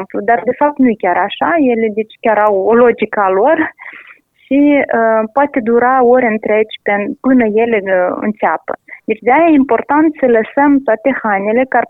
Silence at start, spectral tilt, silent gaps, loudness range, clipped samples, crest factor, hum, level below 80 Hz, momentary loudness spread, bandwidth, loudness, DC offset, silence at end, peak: 0 s; -8.5 dB/octave; none; 1 LU; under 0.1%; 12 dB; none; -52 dBFS; 6 LU; 3.9 kHz; -12 LUFS; under 0.1%; 0.05 s; 0 dBFS